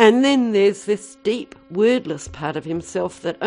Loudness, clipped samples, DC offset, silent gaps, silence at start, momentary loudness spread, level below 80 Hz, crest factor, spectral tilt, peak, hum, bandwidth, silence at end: -21 LUFS; under 0.1%; under 0.1%; none; 0 s; 11 LU; -52 dBFS; 18 dB; -5 dB/octave; 0 dBFS; none; 10.5 kHz; 0 s